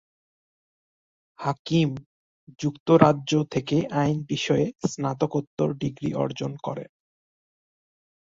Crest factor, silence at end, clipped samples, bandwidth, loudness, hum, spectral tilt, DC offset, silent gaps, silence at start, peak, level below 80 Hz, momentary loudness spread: 24 dB; 1.55 s; under 0.1%; 7.8 kHz; -25 LUFS; none; -6.5 dB/octave; under 0.1%; 1.59-1.65 s, 2.06-2.47 s, 2.80-2.86 s, 5.47-5.57 s; 1.4 s; -2 dBFS; -60 dBFS; 12 LU